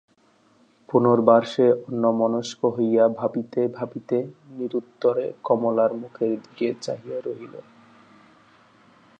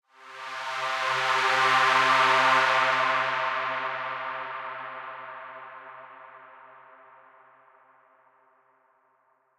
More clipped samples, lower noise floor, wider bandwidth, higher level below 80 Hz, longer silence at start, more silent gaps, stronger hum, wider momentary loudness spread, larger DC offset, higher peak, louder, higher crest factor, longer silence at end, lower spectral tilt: neither; second, -60 dBFS vs -68 dBFS; second, 8.6 kHz vs 15.5 kHz; about the same, -74 dBFS vs -74 dBFS; first, 0.9 s vs 0.2 s; neither; neither; second, 14 LU vs 23 LU; neither; first, -2 dBFS vs -10 dBFS; about the same, -23 LUFS vs -24 LUFS; about the same, 20 dB vs 18 dB; second, 1.6 s vs 2.95 s; first, -7 dB/octave vs -1.5 dB/octave